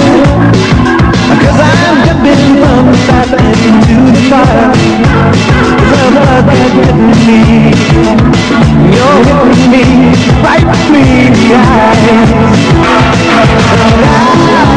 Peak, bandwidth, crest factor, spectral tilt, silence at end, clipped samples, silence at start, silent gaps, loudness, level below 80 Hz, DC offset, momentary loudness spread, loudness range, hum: 0 dBFS; 10.5 kHz; 4 dB; -6.5 dB/octave; 0 s; 3%; 0 s; none; -5 LUFS; -18 dBFS; under 0.1%; 2 LU; 1 LU; none